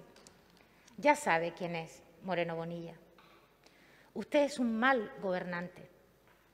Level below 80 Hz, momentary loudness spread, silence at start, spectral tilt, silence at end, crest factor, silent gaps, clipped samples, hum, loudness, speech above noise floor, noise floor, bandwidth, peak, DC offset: -74 dBFS; 18 LU; 0 s; -5 dB/octave; 0.65 s; 24 dB; none; under 0.1%; none; -33 LUFS; 32 dB; -65 dBFS; 15.5 kHz; -12 dBFS; under 0.1%